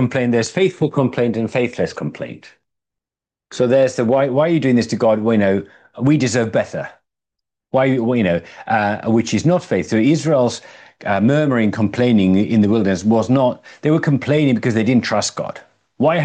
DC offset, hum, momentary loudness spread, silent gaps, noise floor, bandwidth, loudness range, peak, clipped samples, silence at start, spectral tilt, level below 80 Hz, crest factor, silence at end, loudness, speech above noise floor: under 0.1%; none; 8 LU; none; -89 dBFS; 9.4 kHz; 4 LU; -4 dBFS; under 0.1%; 0 s; -6.5 dB/octave; -60 dBFS; 14 dB; 0 s; -17 LUFS; 73 dB